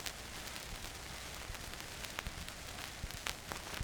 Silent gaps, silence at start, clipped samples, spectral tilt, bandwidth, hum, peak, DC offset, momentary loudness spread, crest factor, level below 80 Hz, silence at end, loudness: none; 0 s; under 0.1%; -2.5 dB/octave; over 20 kHz; none; -12 dBFS; under 0.1%; 4 LU; 34 dB; -54 dBFS; 0 s; -44 LUFS